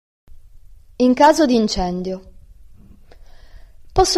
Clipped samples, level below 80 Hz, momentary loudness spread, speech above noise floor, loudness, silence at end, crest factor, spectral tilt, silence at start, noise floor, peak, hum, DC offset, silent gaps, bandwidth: under 0.1%; -36 dBFS; 15 LU; 27 dB; -17 LUFS; 0 s; 18 dB; -4.5 dB/octave; 1 s; -43 dBFS; -2 dBFS; none; under 0.1%; none; 15 kHz